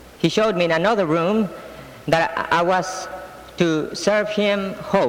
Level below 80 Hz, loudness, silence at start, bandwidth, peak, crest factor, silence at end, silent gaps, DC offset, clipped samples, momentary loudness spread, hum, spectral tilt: -52 dBFS; -20 LUFS; 0 s; 16.5 kHz; -6 dBFS; 16 dB; 0 s; none; under 0.1%; under 0.1%; 15 LU; none; -5 dB/octave